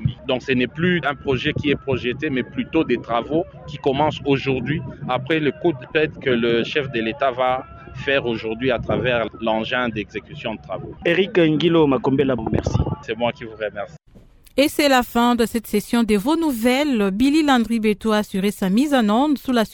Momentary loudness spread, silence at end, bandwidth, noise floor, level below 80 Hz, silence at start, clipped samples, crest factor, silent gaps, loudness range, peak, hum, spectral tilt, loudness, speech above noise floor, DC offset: 10 LU; 0 s; 18 kHz; -48 dBFS; -42 dBFS; 0 s; under 0.1%; 18 dB; none; 4 LU; -2 dBFS; none; -6 dB/octave; -20 LUFS; 28 dB; under 0.1%